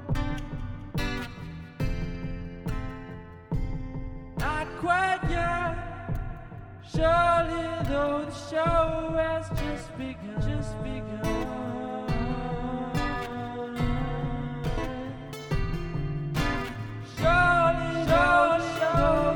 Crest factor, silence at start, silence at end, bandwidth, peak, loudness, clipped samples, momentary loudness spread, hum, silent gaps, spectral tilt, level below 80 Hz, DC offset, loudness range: 18 dB; 0 s; 0 s; 18.5 kHz; -10 dBFS; -28 LUFS; under 0.1%; 15 LU; none; none; -6.5 dB/octave; -36 dBFS; under 0.1%; 10 LU